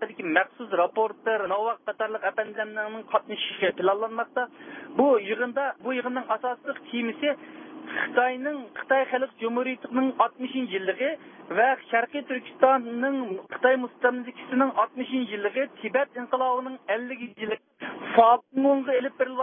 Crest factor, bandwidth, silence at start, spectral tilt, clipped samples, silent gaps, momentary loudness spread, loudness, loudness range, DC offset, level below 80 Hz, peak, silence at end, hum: 22 dB; 3.7 kHz; 0 s; -8.5 dB/octave; under 0.1%; none; 11 LU; -26 LUFS; 3 LU; under 0.1%; -78 dBFS; -4 dBFS; 0 s; none